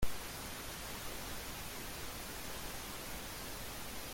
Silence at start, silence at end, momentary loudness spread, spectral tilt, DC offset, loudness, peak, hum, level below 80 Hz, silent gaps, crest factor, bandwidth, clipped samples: 0 s; 0 s; 1 LU; -2.5 dB/octave; under 0.1%; -44 LUFS; -22 dBFS; none; -52 dBFS; none; 20 dB; 17 kHz; under 0.1%